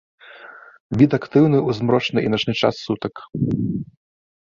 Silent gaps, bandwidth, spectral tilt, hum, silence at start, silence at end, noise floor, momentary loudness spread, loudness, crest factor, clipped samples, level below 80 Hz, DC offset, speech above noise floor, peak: 0.80-0.90 s; 7.2 kHz; -7.5 dB/octave; none; 0.3 s; 0.75 s; -42 dBFS; 14 LU; -20 LUFS; 18 dB; under 0.1%; -50 dBFS; under 0.1%; 23 dB; -2 dBFS